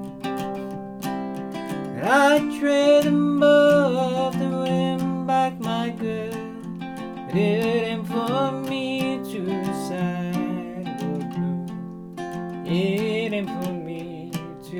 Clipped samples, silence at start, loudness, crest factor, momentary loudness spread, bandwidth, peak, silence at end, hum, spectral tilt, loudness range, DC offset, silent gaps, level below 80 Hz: under 0.1%; 0 s; -23 LUFS; 18 dB; 16 LU; 17.5 kHz; -4 dBFS; 0 s; none; -6 dB/octave; 9 LU; under 0.1%; none; -58 dBFS